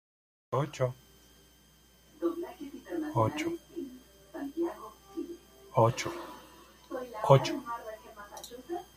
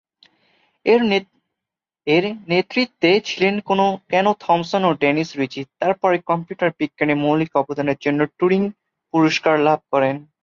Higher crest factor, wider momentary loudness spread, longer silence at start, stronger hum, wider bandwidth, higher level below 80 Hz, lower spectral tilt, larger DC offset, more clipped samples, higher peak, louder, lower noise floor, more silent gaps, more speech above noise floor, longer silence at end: first, 28 dB vs 16 dB; first, 21 LU vs 6 LU; second, 0.5 s vs 0.85 s; neither; first, 15 kHz vs 7.4 kHz; about the same, -64 dBFS vs -62 dBFS; about the same, -6.5 dB/octave vs -6 dB/octave; neither; neither; second, -6 dBFS vs -2 dBFS; second, -33 LUFS vs -19 LUFS; second, -61 dBFS vs -86 dBFS; neither; second, 34 dB vs 68 dB; about the same, 0.1 s vs 0.2 s